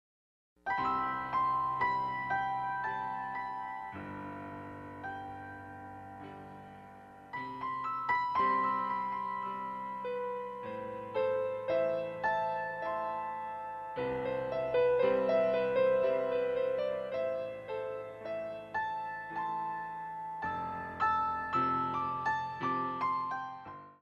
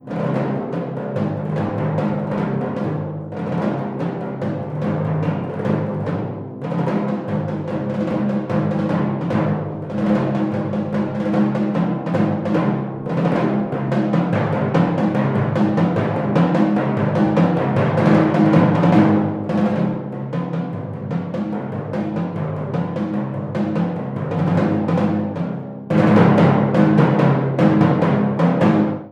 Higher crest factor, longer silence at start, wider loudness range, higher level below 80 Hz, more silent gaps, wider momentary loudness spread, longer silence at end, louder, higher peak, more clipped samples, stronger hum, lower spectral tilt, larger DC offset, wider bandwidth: about the same, 16 dB vs 18 dB; first, 0.65 s vs 0.05 s; first, 11 LU vs 7 LU; second, -68 dBFS vs -56 dBFS; neither; first, 15 LU vs 10 LU; about the same, 0.1 s vs 0 s; second, -34 LUFS vs -19 LUFS; second, -18 dBFS vs -2 dBFS; neither; neither; second, -6.5 dB/octave vs -9.5 dB/octave; neither; about the same, 7.2 kHz vs 7.4 kHz